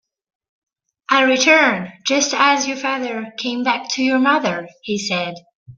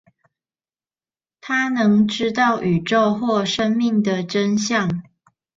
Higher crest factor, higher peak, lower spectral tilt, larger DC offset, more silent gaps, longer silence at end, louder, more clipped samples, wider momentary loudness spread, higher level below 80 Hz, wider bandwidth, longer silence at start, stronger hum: about the same, 18 dB vs 14 dB; first, 0 dBFS vs -6 dBFS; second, -2.5 dB/octave vs -5 dB/octave; neither; first, 5.55-5.66 s vs none; second, 0.05 s vs 0.55 s; about the same, -17 LUFS vs -19 LUFS; neither; first, 12 LU vs 4 LU; second, -66 dBFS vs -58 dBFS; about the same, 7.8 kHz vs 7.6 kHz; second, 1.1 s vs 1.45 s; neither